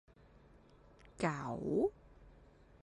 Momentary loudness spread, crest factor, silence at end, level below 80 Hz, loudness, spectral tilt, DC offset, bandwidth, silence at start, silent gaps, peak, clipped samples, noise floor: 4 LU; 20 dB; 0.5 s; -64 dBFS; -38 LUFS; -7 dB/octave; under 0.1%; 11 kHz; 1.05 s; none; -20 dBFS; under 0.1%; -63 dBFS